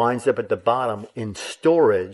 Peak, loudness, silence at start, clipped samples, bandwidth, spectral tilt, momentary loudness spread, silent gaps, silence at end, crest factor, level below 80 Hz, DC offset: -6 dBFS; -21 LUFS; 0 s; under 0.1%; 11.5 kHz; -5.5 dB/octave; 13 LU; none; 0 s; 16 dB; -64 dBFS; under 0.1%